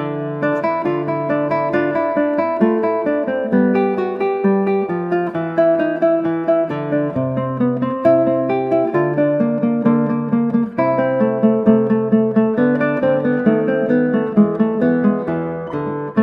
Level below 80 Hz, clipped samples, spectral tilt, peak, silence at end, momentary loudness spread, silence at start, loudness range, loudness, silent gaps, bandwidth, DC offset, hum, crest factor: -58 dBFS; under 0.1%; -10.5 dB/octave; -2 dBFS; 0 s; 5 LU; 0 s; 2 LU; -17 LUFS; none; 5.2 kHz; under 0.1%; none; 16 dB